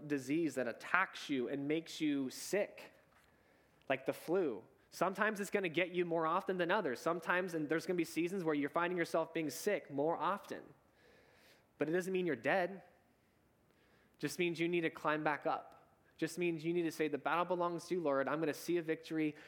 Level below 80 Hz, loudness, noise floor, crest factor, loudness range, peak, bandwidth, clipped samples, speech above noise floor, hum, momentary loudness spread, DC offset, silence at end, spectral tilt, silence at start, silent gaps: -84 dBFS; -37 LUFS; -73 dBFS; 26 dB; 4 LU; -12 dBFS; 19 kHz; under 0.1%; 36 dB; none; 6 LU; under 0.1%; 0 s; -5 dB/octave; 0 s; none